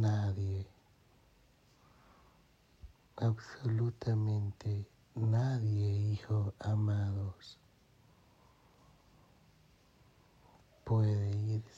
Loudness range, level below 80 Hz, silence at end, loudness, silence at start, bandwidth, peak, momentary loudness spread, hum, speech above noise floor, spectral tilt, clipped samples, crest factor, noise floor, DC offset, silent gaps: 9 LU; -66 dBFS; 0.1 s; -35 LUFS; 0 s; 7.4 kHz; -20 dBFS; 11 LU; none; 33 dB; -8.5 dB/octave; under 0.1%; 16 dB; -67 dBFS; under 0.1%; none